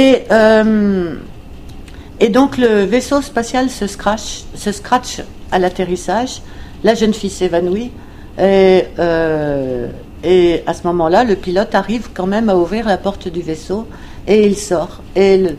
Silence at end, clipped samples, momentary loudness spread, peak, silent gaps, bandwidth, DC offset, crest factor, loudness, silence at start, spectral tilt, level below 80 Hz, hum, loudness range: 0 s; under 0.1%; 15 LU; 0 dBFS; none; 14 kHz; under 0.1%; 14 dB; -14 LUFS; 0 s; -5.5 dB/octave; -34 dBFS; none; 4 LU